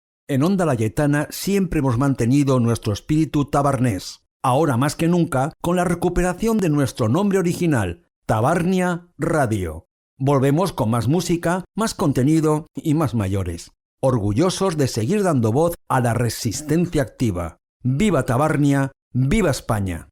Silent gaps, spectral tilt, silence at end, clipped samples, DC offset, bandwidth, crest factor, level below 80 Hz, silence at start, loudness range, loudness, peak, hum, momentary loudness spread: 4.31-4.40 s, 8.16-8.22 s, 9.91-10.17 s, 13.85-13.98 s, 17.69-17.80 s, 19.02-19.11 s; -6.5 dB/octave; 0.05 s; under 0.1%; under 0.1%; 16.5 kHz; 12 dB; -40 dBFS; 0.3 s; 1 LU; -20 LUFS; -6 dBFS; none; 7 LU